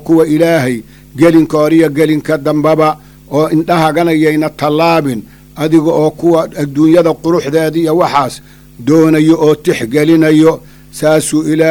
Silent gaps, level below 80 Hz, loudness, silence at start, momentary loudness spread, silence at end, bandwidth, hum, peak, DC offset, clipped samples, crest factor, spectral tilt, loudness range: none; -44 dBFS; -10 LUFS; 0 s; 9 LU; 0 s; 19 kHz; none; 0 dBFS; under 0.1%; under 0.1%; 10 dB; -6.5 dB/octave; 1 LU